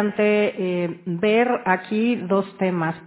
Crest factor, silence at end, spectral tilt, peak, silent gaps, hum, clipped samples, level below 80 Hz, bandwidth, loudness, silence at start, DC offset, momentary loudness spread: 18 dB; 0 s; -10.5 dB/octave; -4 dBFS; none; none; under 0.1%; -66 dBFS; 4 kHz; -21 LUFS; 0 s; under 0.1%; 5 LU